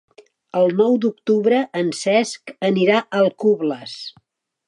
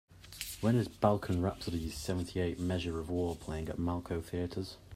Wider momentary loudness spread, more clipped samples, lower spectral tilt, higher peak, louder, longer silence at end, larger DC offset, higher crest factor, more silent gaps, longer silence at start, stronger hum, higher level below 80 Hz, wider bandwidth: about the same, 11 LU vs 9 LU; neither; about the same, -5.5 dB/octave vs -6.5 dB/octave; first, -4 dBFS vs -12 dBFS; first, -19 LUFS vs -35 LUFS; first, 0.6 s vs 0 s; neither; second, 16 dB vs 22 dB; neither; first, 0.55 s vs 0.1 s; neither; second, -74 dBFS vs -54 dBFS; second, 11 kHz vs 16 kHz